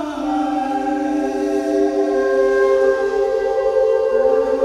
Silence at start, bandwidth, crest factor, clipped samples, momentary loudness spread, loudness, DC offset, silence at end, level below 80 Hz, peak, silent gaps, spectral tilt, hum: 0 s; 11 kHz; 12 dB; under 0.1%; 5 LU; -18 LUFS; under 0.1%; 0 s; -48 dBFS; -6 dBFS; none; -5 dB/octave; none